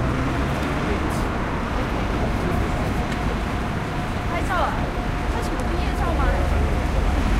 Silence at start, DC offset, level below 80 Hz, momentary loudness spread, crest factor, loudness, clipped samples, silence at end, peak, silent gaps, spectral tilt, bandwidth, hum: 0 s; under 0.1%; -26 dBFS; 3 LU; 14 dB; -24 LUFS; under 0.1%; 0 s; -8 dBFS; none; -6.5 dB/octave; 15.5 kHz; none